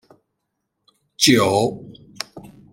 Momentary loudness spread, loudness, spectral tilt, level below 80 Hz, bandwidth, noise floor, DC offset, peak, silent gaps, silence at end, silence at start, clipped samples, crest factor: 19 LU; -17 LUFS; -3.5 dB/octave; -58 dBFS; 16 kHz; -76 dBFS; under 0.1%; -2 dBFS; none; 0.25 s; 1.2 s; under 0.1%; 22 dB